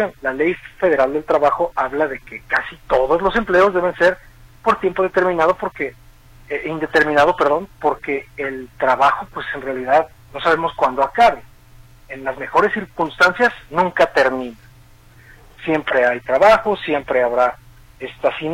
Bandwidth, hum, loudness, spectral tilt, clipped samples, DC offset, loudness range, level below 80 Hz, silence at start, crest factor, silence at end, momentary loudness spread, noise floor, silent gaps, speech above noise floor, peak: 16.5 kHz; none; -18 LUFS; -5.5 dB/octave; under 0.1%; under 0.1%; 2 LU; -46 dBFS; 0 s; 16 dB; 0 s; 12 LU; -46 dBFS; none; 28 dB; -2 dBFS